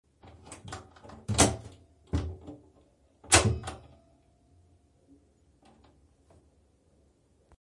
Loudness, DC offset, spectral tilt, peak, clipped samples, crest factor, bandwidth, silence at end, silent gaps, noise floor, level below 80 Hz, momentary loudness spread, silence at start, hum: -27 LUFS; under 0.1%; -3 dB/octave; -6 dBFS; under 0.1%; 28 dB; 11.5 kHz; 3.9 s; none; -66 dBFS; -50 dBFS; 27 LU; 0.45 s; none